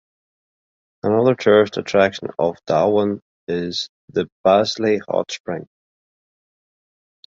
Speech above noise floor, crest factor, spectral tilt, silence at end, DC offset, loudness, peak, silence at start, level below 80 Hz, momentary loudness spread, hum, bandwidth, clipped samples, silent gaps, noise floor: over 72 dB; 18 dB; -5.5 dB/octave; 1.65 s; under 0.1%; -19 LUFS; -2 dBFS; 1.05 s; -56 dBFS; 11 LU; none; 7.6 kHz; under 0.1%; 3.22-3.47 s, 3.89-4.08 s, 4.32-4.44 s, 5.40-5.45 s; under -90 dBFS